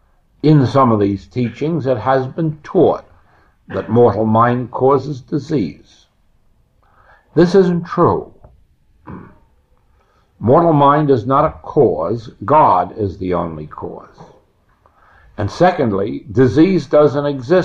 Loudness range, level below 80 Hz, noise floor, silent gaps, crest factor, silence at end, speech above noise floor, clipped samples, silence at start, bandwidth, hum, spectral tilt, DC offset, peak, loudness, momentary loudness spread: 5 LU; -46 dBFS; -55 dBFS; none; 14 dB; 0 s; 41 dB; under 0.1%; 0.45 s; 7.6 kHz; none; -8.5 dB/octave; under 0.1%; -2 dBFS; -15 LUFS; 14 LU